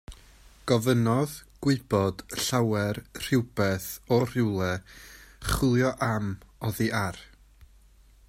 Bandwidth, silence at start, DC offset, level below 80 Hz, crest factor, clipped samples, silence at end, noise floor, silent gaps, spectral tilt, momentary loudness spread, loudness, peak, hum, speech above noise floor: 16 kHz; 0.1 s; under 0.1%; -48 dBFS; 20 dB; under 0.1%; 1.05 s; -56 dBFS; none; -5.5 dB/octave; 12 LU; -27 LUFS; -8 dBFS; none; 30 dB